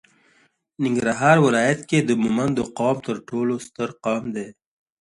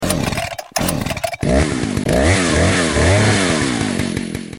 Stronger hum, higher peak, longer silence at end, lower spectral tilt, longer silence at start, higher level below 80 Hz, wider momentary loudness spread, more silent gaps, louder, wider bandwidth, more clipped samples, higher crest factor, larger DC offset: neither; about the same, -2 dBFS vs -2 dBFS; first, 0.6 s vs 0 s; first, -6 dB/octave vs -4.5 dB/octave; first, 0.8 s vs 0 s; second, -58 dBFS vs -28 dBFS; first, 12 LU vs 8 LU; neither; second, -21 LUFS vs -17 LUFS; second, 11.5 kHz vs 17 kHz; neither; about the same, 20 dB vs 16 dB; neither